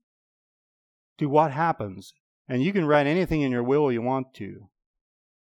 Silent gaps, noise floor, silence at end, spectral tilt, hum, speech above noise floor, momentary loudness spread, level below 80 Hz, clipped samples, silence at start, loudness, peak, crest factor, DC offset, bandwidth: 2.20-2.45 s; under -90 dBFS; 0.9 s; -8 dB/octave; none; over 66 dB; 16 LU; -52 dBFS; under 0.1%; 1.2 s; -24 LUFS; -6 dBFS; 20 dB; under 0.1%; 13 kHz